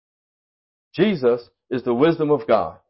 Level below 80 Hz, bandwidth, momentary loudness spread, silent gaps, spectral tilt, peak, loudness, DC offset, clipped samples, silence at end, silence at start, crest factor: -58 dBFS; 5.8 kHz; 9 LU; none; -11.5 dB/octave; -6 dBFS; -20 LUFS; under 0.1%; under 0.1%; 0.15 s; 0.95 s; 16 dB